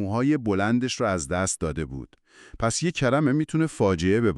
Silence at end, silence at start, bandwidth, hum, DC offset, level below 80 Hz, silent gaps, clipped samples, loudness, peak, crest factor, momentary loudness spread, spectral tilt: 0 s; 0 s; 12 kHz; none; under 0.1%; -46 dBFS; none; under 0.1%; -24 LUFS; -10 dBFS; 14 dB; 7 LU; -5.5 dB/octave